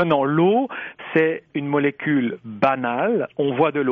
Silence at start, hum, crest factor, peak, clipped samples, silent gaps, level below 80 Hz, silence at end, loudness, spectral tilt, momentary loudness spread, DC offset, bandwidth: 0 s; none; 14 dB; -6 dBFS; under 0.1%; none; -64 dBFS; 0 s; -21 LUFS; -5.5 dB/octave; 8 LU; under 0.1%; 5.6 kHz